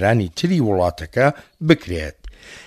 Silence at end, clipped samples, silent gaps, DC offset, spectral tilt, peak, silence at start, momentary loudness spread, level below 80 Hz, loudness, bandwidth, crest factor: 0.05 s; under 0.1%; none; under 0.1%; -6.5 dB/octave; 0 dBFS; 0 s; 10 LU; -40 dBFS; -19 LUFS; 14 kHz; 18 dB